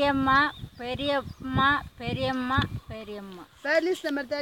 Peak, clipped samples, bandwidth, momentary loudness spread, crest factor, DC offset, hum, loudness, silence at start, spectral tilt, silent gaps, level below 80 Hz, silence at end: -10 dBFS; under 0.1%; 17 kHz; 16 LU; 18 dB; under 0.1%; none; -26 LUFS; 0 s; -6 dB/octave; none; -48 dBFS; 0 s